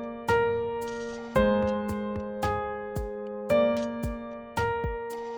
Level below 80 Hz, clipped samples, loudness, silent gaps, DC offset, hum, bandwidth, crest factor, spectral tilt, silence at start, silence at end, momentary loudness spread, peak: -44 dBFS; under 0.1%; -29 LUFS; none; under 0.1%; none; over 20 kHz; 18 dB; -6.5 dB/octave; 0 s; 0 s; 10 LU; -10 dBFS